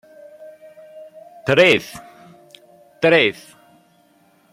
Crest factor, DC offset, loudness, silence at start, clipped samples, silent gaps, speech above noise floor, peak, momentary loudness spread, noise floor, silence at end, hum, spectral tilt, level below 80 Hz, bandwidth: 20 dB; under 0.1%; -16 LUFS; 0.4 s; under 0.1%; none; 41 dB; -2 dBFS; 24 LU; -56 dBFS; 1.2 s; none; -4.5 dB/octave; -60 dBFS; 15.5 kHz